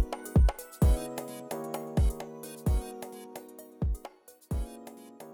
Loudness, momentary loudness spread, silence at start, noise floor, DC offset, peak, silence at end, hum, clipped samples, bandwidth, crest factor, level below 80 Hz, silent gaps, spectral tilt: -32 LUFS; 19 LU; 0 s; -51 dBFS; under 0.1%; -16 dBFS; 0 s; none; under 0.1%; 19 kHz; 16 dB; -32 dBFS; none; -7 dB/octave